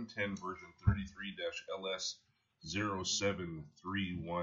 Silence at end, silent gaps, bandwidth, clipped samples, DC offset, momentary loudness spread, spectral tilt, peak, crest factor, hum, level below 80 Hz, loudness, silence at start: 0 s; none; 7.8 kHz; under 0.1%; under 0.1%; 11 LU; -4 dB/octave; -16 dBFS; 22 dB; none; -52 dBFS; -39 LUFS; 0 s